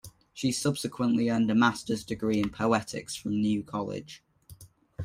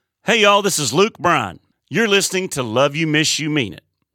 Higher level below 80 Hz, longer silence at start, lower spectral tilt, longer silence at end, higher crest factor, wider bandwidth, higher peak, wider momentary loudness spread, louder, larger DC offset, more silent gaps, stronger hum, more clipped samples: about the same, -60 dBFS vs -58 dBFS; second, 0.05 s vs 0.25 s; first, -5 dB/octave vs -3 dB/octave; second, 0 s vs 0.4 s; about the same, 20 dB vs 16 dB; about the same, 16 kHz vs 17.5 kHz; second, -10 dBFS vs -2 dBFS; first, 14 LU vs 8 LU; second, -28 LUFS vs -17 LUFS; neither; neither; neither; neither